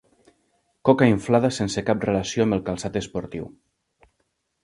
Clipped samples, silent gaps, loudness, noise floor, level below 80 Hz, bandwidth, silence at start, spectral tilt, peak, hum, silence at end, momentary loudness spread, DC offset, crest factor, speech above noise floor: under 0.1%; none; -22 LUFS; -73 dBFS; -50 dBFS; 11.5 kHz; 0.85 s; -6 dB/octave; -2 dBFS; none; 1.15 s; 14 LU; under 0.1%; 22 dB; 51 dB